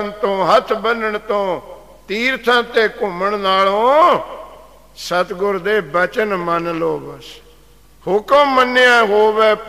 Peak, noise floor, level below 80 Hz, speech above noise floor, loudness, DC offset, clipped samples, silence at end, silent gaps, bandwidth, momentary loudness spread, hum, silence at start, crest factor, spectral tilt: -2 dBFS; -48 dBFS; -50 dBFS; 32 dB; -15 LUFS; 0.3%; under 0.1%; 0 s; none; 15.5 kHz; 13 LU; none; 0 s; 14 dB; -4 dB/octave